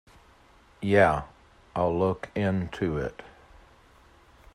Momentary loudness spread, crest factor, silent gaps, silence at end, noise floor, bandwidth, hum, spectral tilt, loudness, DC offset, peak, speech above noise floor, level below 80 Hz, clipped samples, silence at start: 15 LU; 22 dB; none; 1.25 s; -57 dBFS; 11.5 kHz; none; -7.5 dB/octave; -27 LUFS; under 0.1%; -8 dBFS; 32 dB; -52 dBFS; under 0.1%; 0.8 s